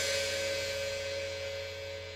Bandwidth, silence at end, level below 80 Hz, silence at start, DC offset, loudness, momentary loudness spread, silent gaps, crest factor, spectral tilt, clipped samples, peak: 16 kHz; 0 s; -62 dBFS; 0 s; under 0.1%; -35 LUFS; 8 LU; none; 16 dB; -1.5 dB/octave; under 0.1%; -20 dBFS